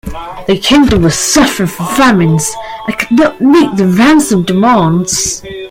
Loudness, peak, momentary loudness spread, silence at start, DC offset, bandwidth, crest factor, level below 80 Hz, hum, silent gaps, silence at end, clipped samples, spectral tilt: -9 LUFS; 0 dBFS; 10 LU; 0.05 s; under 0.1%; 16.5 kHz; 10 dB; -30 dBFS; none; none; 0 s; under 0.1%; -4.5 dB/octave